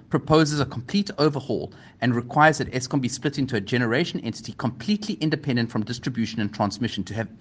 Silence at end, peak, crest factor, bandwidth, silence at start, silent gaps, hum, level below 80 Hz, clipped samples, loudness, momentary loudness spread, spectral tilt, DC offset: 0.05 s; -2 dBFS; 22 dB; 9.8 kHz; 0.1 s; none; none; -56 dBFS; under 0.1%; -24 LUFS; 10 LU; -5.5 dB/octave; under 0.1%